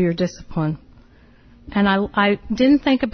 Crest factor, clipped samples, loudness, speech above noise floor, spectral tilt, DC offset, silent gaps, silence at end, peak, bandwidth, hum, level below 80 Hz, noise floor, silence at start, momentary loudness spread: 16 dB; under 0.1%; -19 LUFS; 31 dB; -7 dB/octave; under 0.1%; none; 0.05 s; -4 dBFS; 6.6 kHz; none; -44 dBFS; -49 dBFS; 0 s; 10 LU